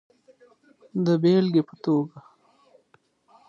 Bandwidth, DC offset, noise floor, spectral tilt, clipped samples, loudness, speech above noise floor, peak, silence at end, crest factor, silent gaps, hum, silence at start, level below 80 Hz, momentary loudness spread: 7.2 kHz; under 0.1%; -64 dBFS; -8.5 dB/octave; under 0.1%; -23 LUFS; 42 dB; -10 dBFS; 1.3 s; 16 dB; none; none; 0.95 s; -74 dBFS; 12 LU